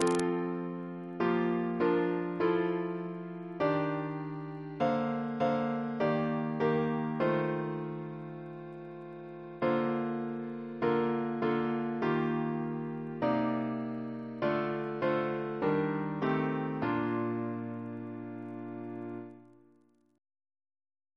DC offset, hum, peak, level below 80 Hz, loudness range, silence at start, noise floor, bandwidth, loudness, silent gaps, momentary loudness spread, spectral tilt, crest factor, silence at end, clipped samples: under 0.1%; none; -10 dBFS; -72 dBFS; 5 LU; 0 s; -67 dBFS; 11 kHz; -33 LUFS; none; 12 LU; -7 dB/octave; 22 dB; 1.7 s; under 0.1%